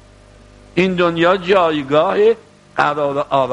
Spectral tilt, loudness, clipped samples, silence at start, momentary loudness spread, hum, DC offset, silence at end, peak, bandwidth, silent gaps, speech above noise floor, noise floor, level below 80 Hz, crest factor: -6.5 dB/octave; -16 LUFS; under 0.1%; 0.75 s; 7 LU; 50 Hz at -45 dBFS; under 0.1%; 0 s; 0 dBFS; 10.5 kHz; none; 29 dB; -44 dBFS; -50 dBFS; 16 dB